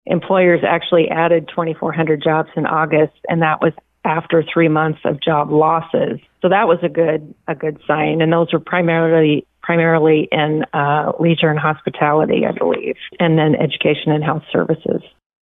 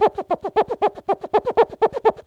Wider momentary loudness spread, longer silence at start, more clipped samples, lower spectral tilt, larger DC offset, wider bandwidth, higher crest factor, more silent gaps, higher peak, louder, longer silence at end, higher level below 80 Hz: about the same, 7 LU vs 5 LU; about the same, 0.05 s vs 0 s; neither; first, -10.5 dB/octave vs -6 dB/octave; neither; second, 3.9 kHz vs 7.4 kHz; about the same, 12 dB vs 16 dB; neither; about the same, -4 dBFS vs -4 dBFS; first, -16 LUFS vs -21 LUFS; first, 0.45 s vs 0.05 s; about the same, -58 dBFS vs -54 dBFS